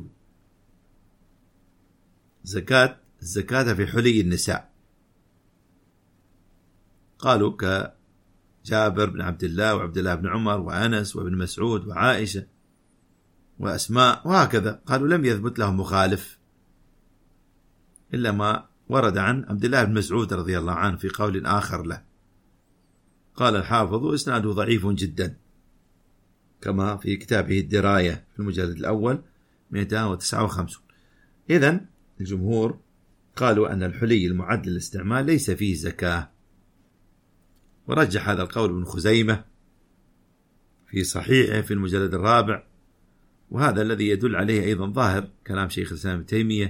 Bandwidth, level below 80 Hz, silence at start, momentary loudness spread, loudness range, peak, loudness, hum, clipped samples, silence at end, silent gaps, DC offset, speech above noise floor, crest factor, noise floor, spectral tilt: 16.5 kHz; -50 dBFS; 0 s; 11 LU; 4 LU; -2 dBFS; -23 LUFS; none; under 0.1%; 0 s; none; under 0.1%; 40 dB; 22 dB; -62 dBFS; -5.5 dB/octave